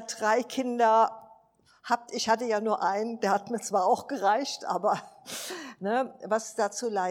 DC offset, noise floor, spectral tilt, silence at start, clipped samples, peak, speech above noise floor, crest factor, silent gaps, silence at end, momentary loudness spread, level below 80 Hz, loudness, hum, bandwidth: under 0.1%; -62 dBFS; -3 dB/octave; 0 s; under 0.1%; -10 dBFS; 35 dB; 18 dB; none; 0 s; 10 LU; -80 dBFS; -28 LUFS; none; 17 kHz